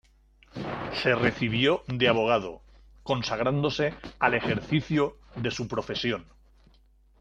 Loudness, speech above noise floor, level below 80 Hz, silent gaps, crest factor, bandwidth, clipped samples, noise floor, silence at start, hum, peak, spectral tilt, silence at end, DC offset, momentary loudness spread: -27 LUFS; 33 dB; -54 dBFS; none; 22 dB; 9 kHz; under 0.1%; -60 dBFS; 0.55 s; none; -6 dBFS; -6 dB/octave; 0.95 s; under 0.1%; 11 LU